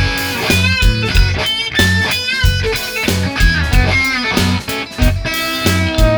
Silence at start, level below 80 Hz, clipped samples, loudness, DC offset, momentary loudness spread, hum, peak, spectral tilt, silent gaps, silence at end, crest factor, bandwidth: 0 s; -18 dBFS; under 0.1%; -14 LUFS; under 0.1%; 4 LU; none; 0 dBFS; -4 dB/octave; none; 0 s; 14 dB; over 20 kHz